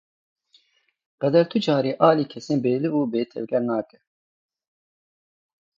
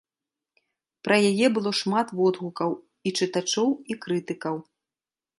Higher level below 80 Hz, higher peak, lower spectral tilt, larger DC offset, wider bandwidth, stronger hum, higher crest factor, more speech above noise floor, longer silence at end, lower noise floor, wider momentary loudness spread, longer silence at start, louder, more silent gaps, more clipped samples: about the same, -72 dBFS vs -74 dBFS; about the same, -4 dBFS vs -6 dBFS; first, -7.5 dB/octave vs -4.5 dB/octave; neither; second, 7.6 kHz vs 11.5 kHz; neither; about the same, 22 dB vs 20 dB; second, 44 dB vs over 66 dB; first, 1.95 s vs 0.8 s; second, -66 dBFS vs under -90 dBFS; about the same, 9 LU vs 10 LU; first, 1.2 s vs 1.05 s; first, -22 LUFS vs -25 LUFS; neither; neither